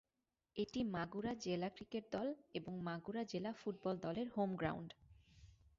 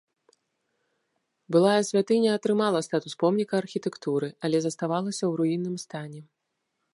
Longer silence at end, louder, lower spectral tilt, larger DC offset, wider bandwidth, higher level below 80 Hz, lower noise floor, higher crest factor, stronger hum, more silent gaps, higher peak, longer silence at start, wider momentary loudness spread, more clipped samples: second, 0.25 s vs 0.7 s; second, -44 LUFS vs -26 LUFS; about the same, -5.5 dB/octave vs -5.5 dB/octave; neither; second, 7.4 kHz vs 11.5 kHz; first, -70 dBFS vs -78 dBFS; first, under -90 dBFS vs -80 dBFS; about the same, 18 dB vs 18 dB; neither; neither; second, -26 dBFS vs -8 dBFS; second, 0.55 s vs 1.5 s; second, 7 LU vs 10 LU; neither